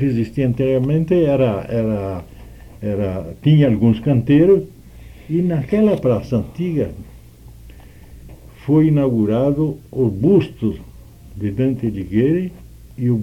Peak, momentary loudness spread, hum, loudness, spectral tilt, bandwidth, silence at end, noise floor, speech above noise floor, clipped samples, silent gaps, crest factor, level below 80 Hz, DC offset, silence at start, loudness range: -4 dBFS; 12 LU; none; -18 LUFS; -9.5 dB/octave; 13 kHz; 0 s; -40 dBFS; 24 dB; under 0.1%; none; 14 dB; -40 dBFS; under 0.1%; 0 s; 5 LU